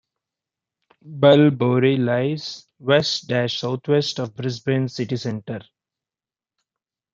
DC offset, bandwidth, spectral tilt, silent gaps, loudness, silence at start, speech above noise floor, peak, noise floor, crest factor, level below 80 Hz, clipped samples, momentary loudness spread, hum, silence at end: under 0.1%; 7.6 kHz; -6 dB/octave; none; -20 LUFS; 1.05 s; over 70 dB; -2 dBFS; under -90 dBFS; 20 dB; -66 dBFS; under 0.1%; 15 LU; none; 1.5 s